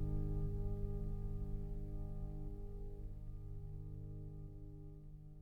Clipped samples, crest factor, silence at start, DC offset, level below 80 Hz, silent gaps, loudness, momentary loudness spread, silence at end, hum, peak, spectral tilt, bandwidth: under 0.1%; 14 dB; 0 s; under 0.1%; -44 dBFS; none; -48 LUFS; 12 LU; 0 s; 50 Hz at -70 dBFS; -28 dBFS; -11 dB/octave; 1.8 kHz